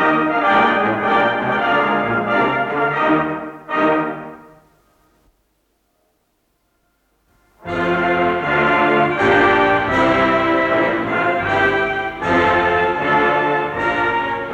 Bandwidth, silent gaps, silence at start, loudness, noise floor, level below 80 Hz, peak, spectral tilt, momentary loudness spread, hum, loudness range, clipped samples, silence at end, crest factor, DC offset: 10 kHz; none; 0 s; -16 LUFS; -65 dBFS; -46 dBFS; -2 dBFS; -6.5 dB/octave; 6 LU; none; 10 LU; under 0.1%; 0 s; 14 dB; under 0.1%